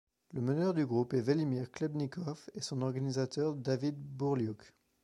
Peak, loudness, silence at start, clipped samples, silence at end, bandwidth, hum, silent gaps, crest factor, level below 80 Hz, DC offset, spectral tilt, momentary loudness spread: -18 dBFS; -35 LUFS; 0.3 s; under 0.1%; 0.35 s; 11.5 kHz; none; none; 18 dB; -74 dBFS; under 0.1%; -7 dB/octave; 9 LU